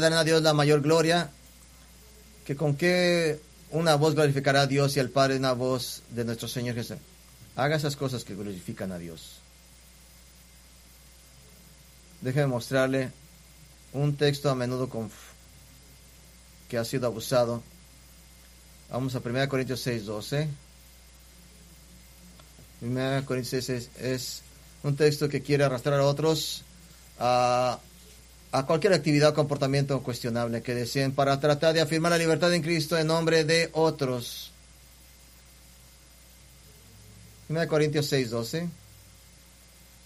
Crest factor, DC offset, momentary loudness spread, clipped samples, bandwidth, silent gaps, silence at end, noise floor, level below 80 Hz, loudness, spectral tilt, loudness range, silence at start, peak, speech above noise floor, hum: 20 dB; under 0.1%; 14 LU; under 0.1%; 15.5 kHz; none; 1.3 s; -54 dBFS; -56 dBFS; -26 LUFS; -5 dB/octave; 10 LU; 0 s; -8 dBFS; 28 dB; none